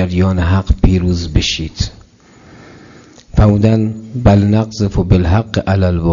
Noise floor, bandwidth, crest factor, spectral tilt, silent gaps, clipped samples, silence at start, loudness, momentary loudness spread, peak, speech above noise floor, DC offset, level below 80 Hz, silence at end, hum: -43 dBFS; 7.4 kHz; 12 dB; -7 dB/octave; none; under 0.1%; 0 s; -14 LUFS; 8 LU; 0 dBFS; 31 dB; under 0.1%; -24 dBFS; 0 s; none